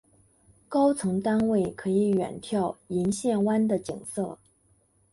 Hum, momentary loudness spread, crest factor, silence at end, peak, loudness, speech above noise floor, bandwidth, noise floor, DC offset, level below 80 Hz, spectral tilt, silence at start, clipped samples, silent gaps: none; 9 LU; 16 dB; 0.8 s; -12 dBFS; -27 LUFS; 40 dB; 11.5 kHz; -65 dBFS; under 0.1%; -60 dBFS; -6.5 dB/octave; 0.7 s; under 0.1%; none